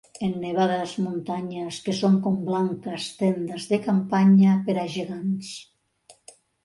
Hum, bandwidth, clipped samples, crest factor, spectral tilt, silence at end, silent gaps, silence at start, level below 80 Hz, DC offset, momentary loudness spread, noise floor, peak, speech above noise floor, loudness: none; 11.5 kHz; under 0.1%; 14 dB; -7 dB/octave; 0.55 s; none; 0.2 s; -68 dBFS; under 0.1%; 13 LU; -57 dBFS; -10 dBFS; 34 dB; -24 LUFS